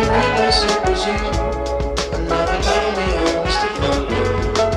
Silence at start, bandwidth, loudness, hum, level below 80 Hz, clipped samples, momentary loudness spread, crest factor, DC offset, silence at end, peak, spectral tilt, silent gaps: 0 s; 12 kHz; -18 LUFS; none; -26 dBFS; under 0.1%; 6 LU; 14 dB; under 0.1%; 0 s; -4 dBFS; -4.5 dB/octave; none